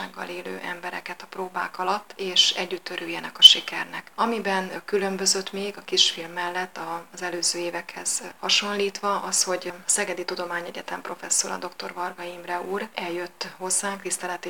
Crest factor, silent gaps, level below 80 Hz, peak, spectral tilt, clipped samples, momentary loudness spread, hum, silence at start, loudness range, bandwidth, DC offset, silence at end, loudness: 26 dB; none; -72 dBFS; 0 dBFS; -0.5 dB/octave; under 0.1%; 14 LU; none; 0 s; 9 LU; 19.5 kHz; 0.2%; 0 s; -23 LUFS